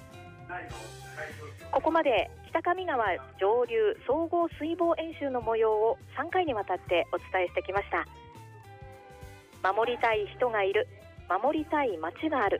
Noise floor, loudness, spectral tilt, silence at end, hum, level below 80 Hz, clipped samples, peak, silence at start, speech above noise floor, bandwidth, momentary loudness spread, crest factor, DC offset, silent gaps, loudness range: -49 dBFS; -29 LUFS; -6 dB/octave; 0 s; none; -56 dBFS; under 0.1%; -16 dBFS; 0 s; 20 dB; 15 kHz; 22 LU; 14 dB; under 0.1%; none; 4 LU